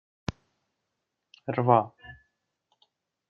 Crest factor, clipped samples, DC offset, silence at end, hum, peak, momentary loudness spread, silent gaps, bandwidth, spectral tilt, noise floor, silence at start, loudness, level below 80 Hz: 26 dB; under 0.1%; under 0.1%; 1.15 s; none; -6 dBFS; 25 LU; none; 7 kHz; -6.5 dB/octave; -83 dBFS; 0.3 s; -27 LUFS; -60 dBFS